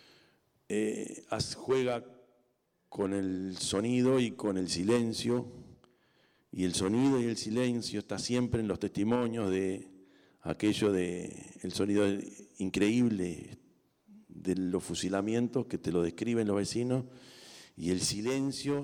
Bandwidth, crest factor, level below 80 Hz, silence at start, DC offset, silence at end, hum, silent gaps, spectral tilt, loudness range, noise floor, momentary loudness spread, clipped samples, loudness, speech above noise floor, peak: 17.5 kHz; 14 dB; -64 dBFS; 0.7 s; under 0.1%; 0 s; none; none; -5 dB/octave; 2 LU; -75 dBFS; 12 LU; under 0.1%; -32 LUFS; 44 dB; -18 dBFS